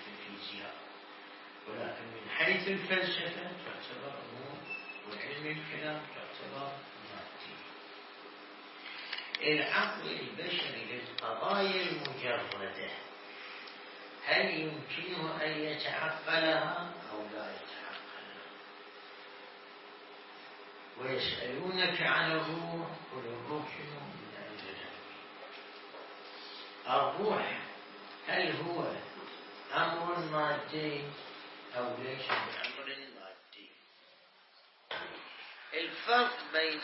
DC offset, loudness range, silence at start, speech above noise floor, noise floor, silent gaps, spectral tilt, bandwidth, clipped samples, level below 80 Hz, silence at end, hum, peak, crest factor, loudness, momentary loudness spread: under 0.1%; 10 LU; 0 s; 27 dB; -63 dBFS; none; -1 dB/octave; 5.8 kHz; under 0.1%; -80 dBFS; 0 s; none; -16 dBFS; 22 dB; -36 LUFS; 19 LU